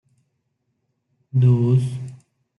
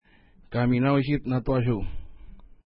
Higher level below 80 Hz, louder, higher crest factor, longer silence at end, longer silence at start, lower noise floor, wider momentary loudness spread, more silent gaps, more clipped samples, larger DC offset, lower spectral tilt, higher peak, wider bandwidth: second, -62 dBFS vs -40 dBFS; first, -19 LUFS vs -25 LUFS; about the same, 16 dB vs 18 dB; first, 0.45 s vs 0.25 s; first, 1.35 s vs 0.5 s; first, -73 dBFS vs -55 dBFS; first, 17 LU vs 13 LU; neither; neither; neither; second, -10 dB/octave vs -12 dB/octave; first, -6 dBFS vs -10 dBFS; second, 3.7 kHz vs 5.4 kHz